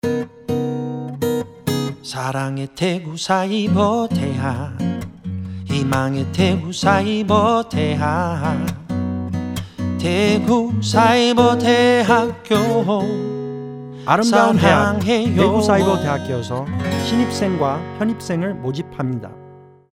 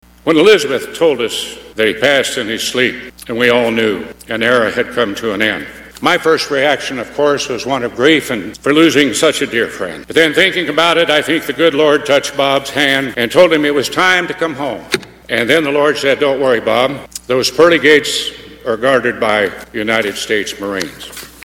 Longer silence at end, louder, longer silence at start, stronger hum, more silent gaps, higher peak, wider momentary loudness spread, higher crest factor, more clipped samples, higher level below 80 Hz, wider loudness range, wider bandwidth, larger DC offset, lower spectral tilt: first, 0.3 s vs 0.15 s; second, -18 LUFS vs -13 LUFS; second, 0.05 s vs 0.25 s; neither; neither; about the same, 0 dBFS vs 0 dBFS; about the same, 12 LU vs 11 LU; about the same, 18 dB vs 14 dB; second, under 0.1% vs 0.2%; about the same, -48 dBFS vs -48 dBFS; first, 6 LU vs 3 LU; about the same, 16.5 kHz vs 17.5 kHz; neither; first, -6 dB/octave vs -3.5 dB/octave